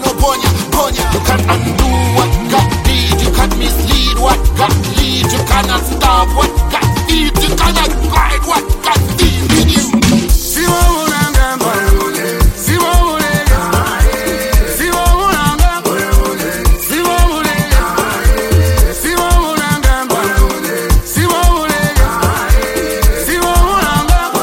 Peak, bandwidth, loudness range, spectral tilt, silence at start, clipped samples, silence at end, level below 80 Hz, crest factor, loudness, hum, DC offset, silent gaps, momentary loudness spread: 0 dBFS; 17 kHz; 1 LU; -4 dB/octave; 0 s; under 0.1%; 0 s; -14 dBFS; 10 dB; -12 LUFS; none; under 0.1%; none; 3 LU